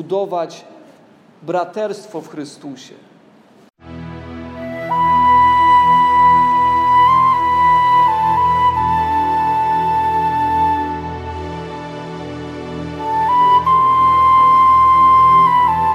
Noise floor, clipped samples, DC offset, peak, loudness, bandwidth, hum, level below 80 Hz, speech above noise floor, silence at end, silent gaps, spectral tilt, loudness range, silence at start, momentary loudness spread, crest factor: -47 dBFS; under 0.1%; under 0.1%; -4 dBFS; -13 LUFS; 12.5 kHz; none; -42 dBFS; 24 dB; 0 s; none; -6 dB/octave; 16 LU; 0 s; 19 LU; 10 dB